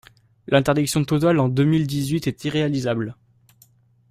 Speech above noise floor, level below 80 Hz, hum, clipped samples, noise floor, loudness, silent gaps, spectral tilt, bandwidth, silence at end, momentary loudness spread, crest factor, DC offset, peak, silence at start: 37 dB; -52 dBFS; none; under 0.1%; -56 dBFS; -21 LUFS; none; -6 dB/octave; 16 kHz; 1 s; 6 LU; 18 dB; under 0.1%; -4 dBFS; 0.5 s